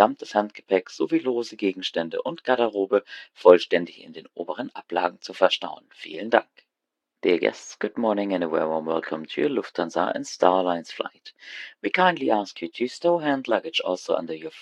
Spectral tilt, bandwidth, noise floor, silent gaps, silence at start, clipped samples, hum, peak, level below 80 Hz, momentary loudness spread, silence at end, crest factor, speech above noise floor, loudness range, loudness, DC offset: -4.5 dB/octave; 9.8 kHz; -84 dBFS; none; 0 s; under 0.1%; none; 0 dBFS; -78 dBFS; 14 LU; 0 s; 24 dB; 60 dB; 3 LU; -24 LUFS; under 0.1%